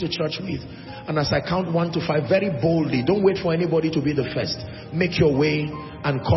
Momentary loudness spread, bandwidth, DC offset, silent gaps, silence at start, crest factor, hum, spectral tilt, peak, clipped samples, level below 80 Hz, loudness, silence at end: 11 LU; 6 kHz; under 0.1%; none; 0 s; 16 dB; none; -7 dB/octave; -6 dBFS; under 0.1%; -48 dBFS; -22 LUFS; 0 s